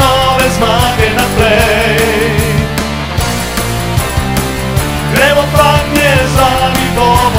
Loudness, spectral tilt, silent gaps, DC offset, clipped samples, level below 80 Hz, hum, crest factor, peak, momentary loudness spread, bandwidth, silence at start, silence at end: -10 LUFS; -4.5 dB/octave; none; under 0.1%; 0.4%; -22 dBFS; none; 10 dB; 0 dBFS; 6 LU; 16.5 kHz; 0 s; 0 s